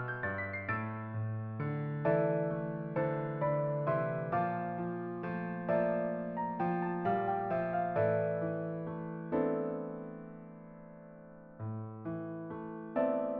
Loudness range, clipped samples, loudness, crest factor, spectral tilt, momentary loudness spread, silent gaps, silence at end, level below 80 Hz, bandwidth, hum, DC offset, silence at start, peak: 6 LU; under 0.1%; -35 LUFS; 16 dB; -8 dB/octave; 14 LU; none; 0 s; -70 dBFS; 4.8 kHz; none; under 0.1%; 0 s; -18 dBFS